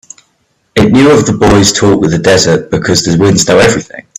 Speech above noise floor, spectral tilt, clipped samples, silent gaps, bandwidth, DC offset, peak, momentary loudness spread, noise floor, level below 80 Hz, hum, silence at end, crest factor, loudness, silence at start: 50 dB; -4.5 dB/octave; 0.2%; none; 16 kHz; under 0.1%; 0 dBFS; 5 LU; -57 dBFS; -32 dBFS; none; 0.2 s; 8 dB; -8 LUFS; 0.75 s